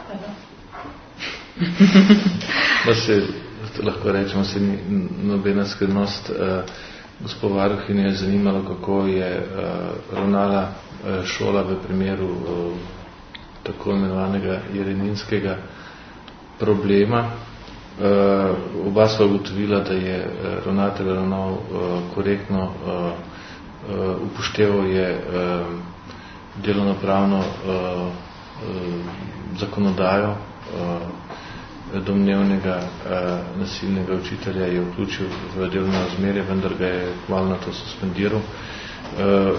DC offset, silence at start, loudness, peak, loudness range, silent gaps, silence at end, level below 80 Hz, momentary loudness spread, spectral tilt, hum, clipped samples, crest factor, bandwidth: under 0.1%; 0 s; -22 LUFS; 0 dBFS; 7 LU; none; 0 s; -46 dBFS; 17 LU; -6.5 dB/octave; none; under 0.1%; 22 dB; 6.6 kHz